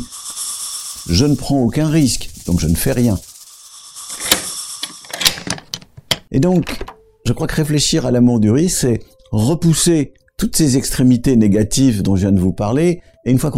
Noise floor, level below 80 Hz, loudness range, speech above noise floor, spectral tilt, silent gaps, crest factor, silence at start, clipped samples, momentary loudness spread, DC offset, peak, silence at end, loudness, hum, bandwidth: -39 dBFS; -34 dBFS; 5 LU; 25 dB; -5 dB/octave; none; 16 dB; 0 s; under 0.1%; 13 LU; under 0.1%; 0 dBFS; 0 s; -16 LUFS; none; 16.5 kHz